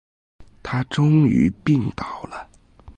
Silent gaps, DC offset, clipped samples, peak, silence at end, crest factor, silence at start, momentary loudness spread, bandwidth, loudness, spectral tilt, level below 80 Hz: none; under 0.1%; under 0.1%; -6 dBFS; 0.05 s; 16 dB; 0.4 s; 20 LU; 9 kHz; -20 LUFS; -8 dB/octave; -46 dBFS